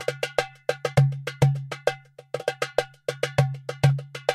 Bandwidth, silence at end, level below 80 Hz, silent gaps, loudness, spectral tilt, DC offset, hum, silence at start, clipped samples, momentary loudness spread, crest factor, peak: 13.5 kHz; 0 s; -56 dBFS; none; -26 LUFS; -6 dB/octave; under 0.1%; none; 0 s; under 0.1%; 8 LU; 22 dB; -2 dBFS